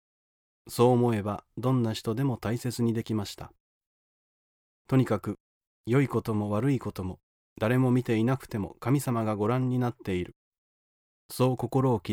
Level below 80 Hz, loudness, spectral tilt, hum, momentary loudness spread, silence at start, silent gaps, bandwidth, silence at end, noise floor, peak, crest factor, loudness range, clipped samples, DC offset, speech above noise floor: -60 dBFS; -28 LUFS; -7 dB/octave; none; 13 LU; 0.65 s; 3.60-3.81 s, 3.87-4.85 s, 5.40-5.61 s, 5.67-5.84 s, 7.23-7.56 s, 10.36-10.52 s, 10.58-11.29 s; 17 kHz; 0 s; under -90 dBFS; -10 dBFS; 18 dB; 4 LU; under 0.1%; under 0.1%; over 63 dB